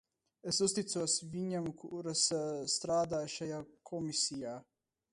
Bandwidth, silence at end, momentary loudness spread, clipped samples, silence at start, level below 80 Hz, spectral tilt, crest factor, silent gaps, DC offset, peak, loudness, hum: 11.5 kHz; 0.5 s; 13 LU; under 0.1%; 0.45 s; -72 dBFS; -3 dB/octave; 20 dB; none; under 0.1%; -18 dBFS; -35 LUFS; none